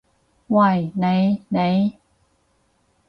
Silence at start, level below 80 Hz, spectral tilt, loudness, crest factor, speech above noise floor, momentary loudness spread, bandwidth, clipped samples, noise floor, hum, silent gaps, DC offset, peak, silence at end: 0.5 s; -60 dBFS; -9.5 dB/octave; -20 LUFS; 16 dB; 46 dB; 5 LU; 5.6 kHz; under 0.1%; -64 dBFS; none; none; under 0.1%; -6 dBFS; 1.15 s